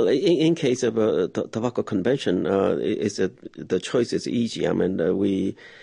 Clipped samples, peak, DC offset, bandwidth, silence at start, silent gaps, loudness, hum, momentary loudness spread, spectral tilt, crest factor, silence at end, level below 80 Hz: under 0.1%; -8 dBFS; under 0.1%; 10.5 kHz; 0 s; none; -23 LUFS; none; 7 LU; -6 dB/octave; 14 dB; 0 s; -56 dBFS